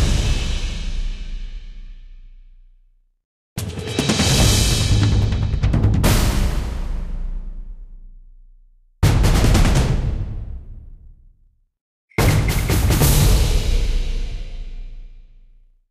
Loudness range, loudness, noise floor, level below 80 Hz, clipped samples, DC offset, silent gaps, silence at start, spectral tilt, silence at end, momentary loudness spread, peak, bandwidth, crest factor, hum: 8 LU; -19 LUFS; -56 dBFS; -22 dBFS; under 0.1%; under 0.1%; 3.25-3.56 s, 11.81-12.08 s; 0 s; -4.5 dB/octave; 0.7 s; 20 LU; -4 dBFS; 15.5 kHz; 16 dB; none